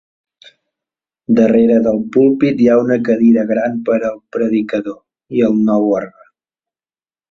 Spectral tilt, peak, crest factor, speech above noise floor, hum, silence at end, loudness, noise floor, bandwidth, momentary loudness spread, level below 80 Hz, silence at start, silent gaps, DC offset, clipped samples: -8.5 dB/octave; 0 dBFS; 14 dB; over 77 dB; none; 1.2 s; -14 LUFS; under -90 dBFS; 6.6 kHz; 10 LU; -56 dBFS; 1.3 s; none; under 0.1%; under 0.1%